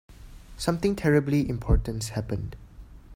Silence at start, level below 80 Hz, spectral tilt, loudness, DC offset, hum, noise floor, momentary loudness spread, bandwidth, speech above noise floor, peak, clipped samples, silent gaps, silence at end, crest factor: 0.1 s; -34 dBFS; -6.5 dB/octave; -27 LUFS; under 0.1%; none; -46 dBFS; 11 LU; 16 kHz; 21 dB; -8 dBFS; under 0.1%; none; 0 s; 18 dB